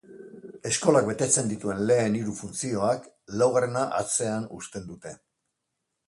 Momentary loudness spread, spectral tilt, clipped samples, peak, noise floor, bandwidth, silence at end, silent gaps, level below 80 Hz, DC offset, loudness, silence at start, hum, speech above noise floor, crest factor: 18 LU; -4.5 dB/octave; under 0.1%; -6 dBFS; -81 dBFS; 11.5 kHz; 0.95 s; none; -62 dBFS; under 0.1%; -25 LUFS; 0.1 s; none; 55 dB; 22 dB